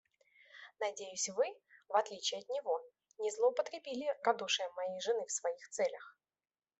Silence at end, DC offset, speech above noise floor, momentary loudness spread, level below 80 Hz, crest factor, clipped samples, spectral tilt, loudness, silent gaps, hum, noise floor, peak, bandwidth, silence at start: 0.7 s; under 0.1%; 30 dB; 8 LU; under -90 dBFS; 22 dB; under 0.1%; -0.5 dB/octave; -37 LUFS; none; none; -67 dBFS; -16 dBFS; 8.2 kHz; 0.55 s